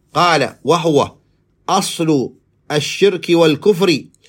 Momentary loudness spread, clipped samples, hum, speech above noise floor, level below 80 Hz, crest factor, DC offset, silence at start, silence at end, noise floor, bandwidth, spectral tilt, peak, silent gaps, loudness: 8 LU; under 0.1%; none; 21 dB; -60 dBFS; 14 dB; under 0.1%; 0.15 s; 0.25 s; -35 dBFS; 16.5 kHz; -4.5 dB/octave; 0 dBFS; none; -15 LUFS